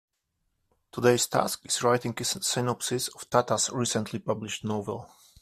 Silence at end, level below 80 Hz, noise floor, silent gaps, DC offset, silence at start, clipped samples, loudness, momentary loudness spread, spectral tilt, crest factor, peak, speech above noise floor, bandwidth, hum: 0.35 s; -64 dBFS; -78 dBFS; none; under 0.1%; 0.95 s; under 0.1%; -27 LUFS; 8 LU; -3.5 dB/octave; 22 dB; -6 dBFS; 50 dB; 15.5 kHz; none